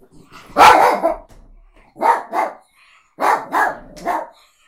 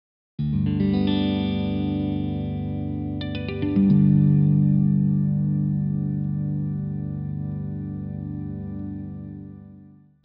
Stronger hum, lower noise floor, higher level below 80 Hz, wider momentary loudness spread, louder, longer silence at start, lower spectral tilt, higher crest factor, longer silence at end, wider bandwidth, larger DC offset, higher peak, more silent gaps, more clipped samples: second, none vs 50 Hz at -50 dBFS; first, -53 dBFS vs -49 dBFS; about the same, -48 dBFS vs -44 dBFS; about the same, 17 LU vs 15 LU; first, -16 LUFS vs -24 LUFS; about the same, 0.35 s vs 0.4 s; second, -2.5 dB/octave vs -8.5 dB/octave; about the same, 18 dB vs 16 dB; about the same, 0.4 s vs 0.4 s; first, 16.5 kHz vs 5.2 kHz; neither; first, 0 dBFS vs -8 dBFS; neither; neither